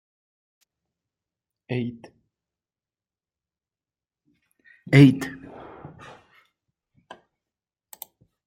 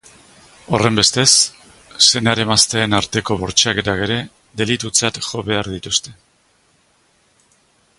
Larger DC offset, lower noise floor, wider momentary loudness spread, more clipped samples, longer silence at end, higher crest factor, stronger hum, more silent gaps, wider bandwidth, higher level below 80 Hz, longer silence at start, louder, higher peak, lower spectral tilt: neither; first, under -90 dBFS vs -58 dBFS; first, 29 LU vs 10 LU; neither; first, 2.6 s vs 1.85 s; first, 26 dB vs 18 dB; neither; neither; about the same, 16 kHz vs 16 kHz; second, -62 dBFS vs -46 dBFS; first, 1.7 s vs 0.7 s; second, -20 LUFS vs -15 LUFS; about the same, -2 dBFS vs 0 dBFS; first, -7.5 dB/octave vs -2.5 dB/octave